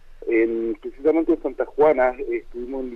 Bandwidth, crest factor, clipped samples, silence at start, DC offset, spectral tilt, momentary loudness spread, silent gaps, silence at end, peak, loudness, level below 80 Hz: 4.1 kHz; 18 dB; under 0.1%; 0.05 s; under 0.1%; -8 dB/octave; 11 LU; none; 0 s; -4 dBFS; -22 LUFS; -44 dBFS